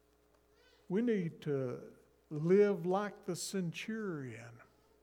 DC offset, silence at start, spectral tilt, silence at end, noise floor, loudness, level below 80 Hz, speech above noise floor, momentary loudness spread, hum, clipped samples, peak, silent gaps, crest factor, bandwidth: under 0.1%; 0.9 s; -6 dB/octave; 0.4 s; -70 dBFS; -36 LUFS; -76 dBFS; 35 dB; 18 LU; none; under 0.1%; -18 dBFS; none; 18 dB; 16.5 kHz